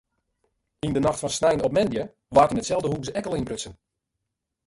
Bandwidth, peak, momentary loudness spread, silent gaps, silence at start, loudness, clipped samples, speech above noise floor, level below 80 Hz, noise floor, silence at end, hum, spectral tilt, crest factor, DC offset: 11.5 kHz; -4 dBFS; 12 LU; none; 0.85 s; -24 LUFS; under 0.1%; 58 dB; -50 dBFS; -82 dBFS; 0.95 s; none; -5 dB/octave; 22 dB; under 0.1%